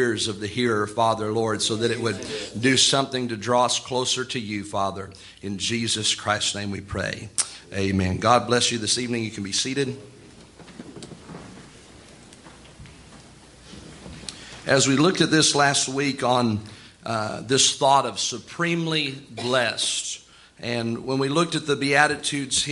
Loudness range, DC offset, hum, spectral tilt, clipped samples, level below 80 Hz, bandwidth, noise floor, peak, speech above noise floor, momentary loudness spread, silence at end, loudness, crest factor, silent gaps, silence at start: 10 LU; under 0.1%; none; -3 dB/octave; under 0.1%; -58 dBFS; 11.5 kHz; -48 dBFS; -2 dBFS; 24 dB; 19 LU; 0 s; -22 LUFS; 22 dB; none; 0 s